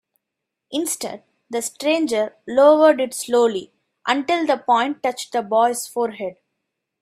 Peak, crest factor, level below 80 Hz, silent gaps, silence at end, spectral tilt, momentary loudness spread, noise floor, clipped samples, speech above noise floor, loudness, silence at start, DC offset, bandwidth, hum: -2 dBFS; 18 dB; -70 dBFS; none; 0.7 s; -2.5 dB/octave; 14 LU; -82 dBFS; under 0.1%; 62 dB; -20 LUFS; 0.7 s; under 0.1%; 16 kHz; none